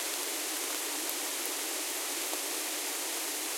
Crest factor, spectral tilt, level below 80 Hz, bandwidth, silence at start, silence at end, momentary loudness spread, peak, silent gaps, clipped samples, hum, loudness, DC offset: 20 dB; 2.5 dB/octave; -84 dBFS; 17 kHz; 0 s; 0 s; 0 LU; -16 dBFS; none; under 0.1%; none; -32 LUFS; under 0.1%